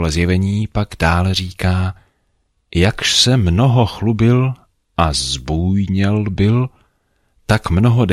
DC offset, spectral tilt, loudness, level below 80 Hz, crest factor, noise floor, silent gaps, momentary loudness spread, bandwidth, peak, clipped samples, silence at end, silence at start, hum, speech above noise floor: under 0.1%; -5.5 dB/octave; -16 LUFS; -32 dBFS; 14 dB; -64 dBFS; none; 9 LU; 13 kHz; -2 dBFS; under 0.1%; 0 s; 0 s; none; 49 dB